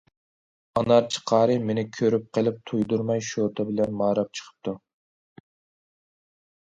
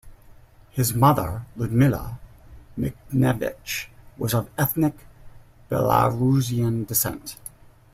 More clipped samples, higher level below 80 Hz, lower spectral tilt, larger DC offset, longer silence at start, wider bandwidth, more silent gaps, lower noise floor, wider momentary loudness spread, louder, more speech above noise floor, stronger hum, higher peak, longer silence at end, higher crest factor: neither; second, -62 dBFS vs -46 dBFS; about the same, -6 dB/octave vs -6 dB/octave; neither; first, 0.75 s vs 0.05 s; second, 9.4 kHz vs 16 kHz; neither; first, under -90 dBFS vs -49 dBFS; second, 13 LU vs 17 LU; about the same, -25 LUFS vs -23 LUFS; first, over 66 dB vs 27 dB; neither; about the same, -6 dBFS vs -4 dBFS; first, 1.9 s vs 0.45 s; about the same, 20 dB vs 20 dB